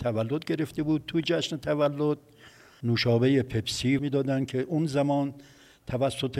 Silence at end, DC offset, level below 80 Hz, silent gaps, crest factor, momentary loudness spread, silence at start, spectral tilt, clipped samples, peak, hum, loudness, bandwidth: 0 s; under 0.1%; -58 dBFS; none; 16 dB; 6 LU; 0 s; -6 dB/octave; under 0.1%; -12 dBFS; none; -27 LUFS; 15 kHz